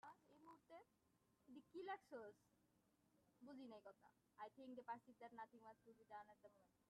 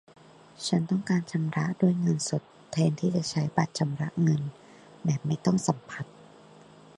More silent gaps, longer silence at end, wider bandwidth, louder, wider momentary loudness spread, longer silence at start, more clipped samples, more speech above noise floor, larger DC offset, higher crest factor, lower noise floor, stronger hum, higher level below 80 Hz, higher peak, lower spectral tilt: neither; second, 0.1 s vs 0.75 s; about the same, 10 kHz vs 11 kHz; second, -61 LUFS vs -28 LUFS; first, 13 LU vs 9 LU; second, 0.05 s vs 0.6 s; neither; about the same, 23 dB vs 25 dB; neither; about the same, 20 dB vs 22 dB; first, -84 dBFS vs -52 dBFS; neither; second, under -90 dBFS vs -66 dBFS; second, -42 dBFS vs -8 dBFS; about the same, -5.5 dB/octave vs -6 dB/octave